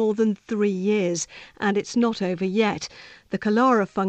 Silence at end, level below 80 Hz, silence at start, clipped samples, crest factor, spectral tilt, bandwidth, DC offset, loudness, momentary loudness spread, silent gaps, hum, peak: 0 s; -62 dBFS; 0 s; under 0.1%; 16 dB; -5.5 dB/octave; 8.8 kHz; under 0.1%; -23 LUFS; 11 LU; none; none; -8 dBFS